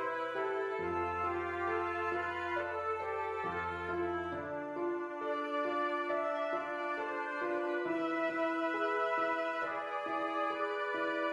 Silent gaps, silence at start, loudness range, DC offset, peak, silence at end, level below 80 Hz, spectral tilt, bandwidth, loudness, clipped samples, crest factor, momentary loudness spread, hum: none; 0 s; 2 LU; under 0.1%; -22 dBFS; 0 s; -68 dBFS; -6 dB/octave; 11 kHz; -36 LUFS; under 0.1%; 14 dB; 4 LU; none